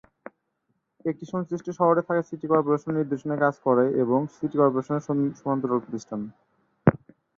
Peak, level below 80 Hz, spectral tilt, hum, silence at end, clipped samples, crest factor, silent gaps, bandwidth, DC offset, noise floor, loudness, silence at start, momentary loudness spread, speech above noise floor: -4 dBFS; -60 dBFS; -9 dB/octave; none; 0.4 s; under 0.1%; 22 dB; none; 7.4 kHz; under 0.1%; -75 dBFS; -25 LUFS; 1.05 s; 10 LU; 51 dB